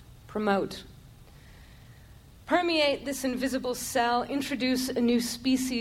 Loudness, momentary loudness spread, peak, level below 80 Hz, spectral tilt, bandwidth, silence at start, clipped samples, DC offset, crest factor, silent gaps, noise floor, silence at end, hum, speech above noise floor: -28 LUFS; 6 LU; -10 dBFS; -54 dBFS; -3.5 dB/octave; 16.5 kHz; 0 s; under 0.1%; under 0.1%; 18 dB; none; -51 dBFS; 0 s; none; 24 dB